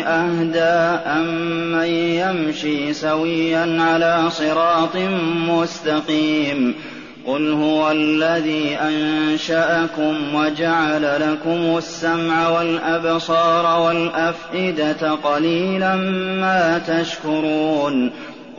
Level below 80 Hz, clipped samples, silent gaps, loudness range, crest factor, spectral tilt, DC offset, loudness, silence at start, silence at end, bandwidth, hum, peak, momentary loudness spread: -58 dBFS; under 0.1%; none; 1 LU; 12 dB; -3.5 dB/octave; 0.2%; -18 LUFS; 0 s; 0 s; 7.2 kHz; none; -6 dBFS; 5 LU